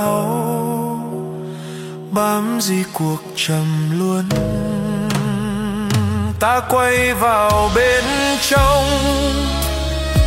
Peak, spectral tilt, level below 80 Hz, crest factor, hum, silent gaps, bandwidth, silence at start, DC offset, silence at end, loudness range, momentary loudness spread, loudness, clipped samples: -2 dBFS; -5 dB/octave; -28 dBFS; 16 dB; none; none; 16.5 kHz; 0 s; under 0.1%; 0 s; 6 LU; 9 LU; -17 LUFS; under 0.1%